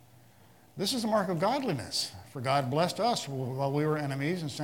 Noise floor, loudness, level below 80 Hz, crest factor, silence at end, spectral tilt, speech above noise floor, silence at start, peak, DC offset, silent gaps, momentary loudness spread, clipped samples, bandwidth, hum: -59 dBFS; -30 LUFS; -72 dBFS; 20 dB; 0 s; -5 dB/octave; 29 dB; 0.75 s; -12 dBFS; under 0.1%; none; 6 LU; under 0.1%; 18 kHz; none